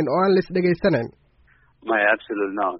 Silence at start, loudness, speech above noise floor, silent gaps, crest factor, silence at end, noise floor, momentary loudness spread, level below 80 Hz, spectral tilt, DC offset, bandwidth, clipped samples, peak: 0 s; -21 LUFS; 37 dB; none; 16 dB; 0 s; -58 dBFS; 8 LU; -54 dBFS; -5 dB/octave; under 0.1%; 5.8 kHz; under 0.1%; -4 dBFS